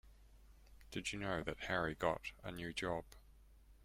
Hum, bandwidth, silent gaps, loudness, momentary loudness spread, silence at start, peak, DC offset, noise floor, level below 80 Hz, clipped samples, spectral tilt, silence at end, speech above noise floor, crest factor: none; 16 kHz; none; -42 LUFS; 9 LU; 0.05 s; -22 dBFS; under 0.1%; -64 dBFS; -60 dBFS; under 0.1%; -4.5 dB/octave; 0.05 s; 22 dB; 22 dB